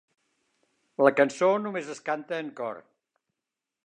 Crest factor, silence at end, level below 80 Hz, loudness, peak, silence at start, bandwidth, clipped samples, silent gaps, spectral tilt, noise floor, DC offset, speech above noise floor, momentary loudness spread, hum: 24 dB; 1.05 s; -86 dBFS; -27 LUFS; -6 dBFS; 1 s; 10 kHz; under 0.1%; none; -5 dB/octave; -88 dBFS; under 0.1%; 62 dB; 15 LU; none